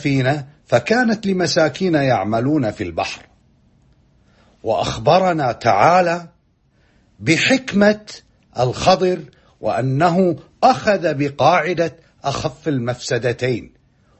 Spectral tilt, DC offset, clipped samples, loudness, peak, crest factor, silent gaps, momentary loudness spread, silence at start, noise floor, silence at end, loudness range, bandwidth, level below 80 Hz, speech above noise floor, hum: -5.5 dB/octave; under 0.1%; under 0.1%; -18 LUFS; 0 dBFS; 18 dB; none; 11 LU; 0 s; -59 dBFS; 0.55 s; 4 LU; 8.6 kHz; -48 dBFS; 42 dB; none